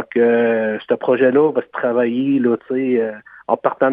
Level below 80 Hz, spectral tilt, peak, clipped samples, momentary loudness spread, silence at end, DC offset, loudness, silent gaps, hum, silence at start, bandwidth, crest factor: -68 dBFS; -10 dB/octave; 0 dBFS; under 0.1%; 6 LU; 0 s; under 0.1%; -17 LUFS; none; none; 0 s; 3.8 kHz; 16 dB